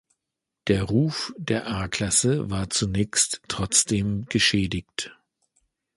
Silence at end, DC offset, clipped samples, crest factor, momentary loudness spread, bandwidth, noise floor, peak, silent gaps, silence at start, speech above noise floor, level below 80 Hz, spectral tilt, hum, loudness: 0.85 s; under 0.1%; under 0.1%; 22 dB; 10 LU; 11.5 kHz; -85 dBFS; -4 dBFS; none; 0.65 s; 60 dB; -46 dBFS; -3.5 dB/octave; none; -24 LUFS